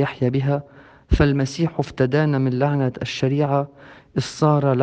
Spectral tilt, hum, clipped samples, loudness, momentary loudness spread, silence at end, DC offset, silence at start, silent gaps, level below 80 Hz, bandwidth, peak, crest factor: -7 dB/octave; none; under 0.1%; -21 LUFS; 8 LU; 0 s; under 0.1%; 0 s; none; -36 dBFS; 8.8 kHz; -4 dBFS; 16 dB